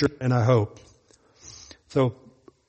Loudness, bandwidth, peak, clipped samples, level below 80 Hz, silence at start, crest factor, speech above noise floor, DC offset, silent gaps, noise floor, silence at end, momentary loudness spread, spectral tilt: -24 LUFS; 8.4 kHz; -6 dBFS; under 0.1%; -56 dBFS; 0 s; 20 dB; 36 dB; under 0.1%; none; -59 dBFS; 0.55 s; 24 LU; -7.5 dB/octave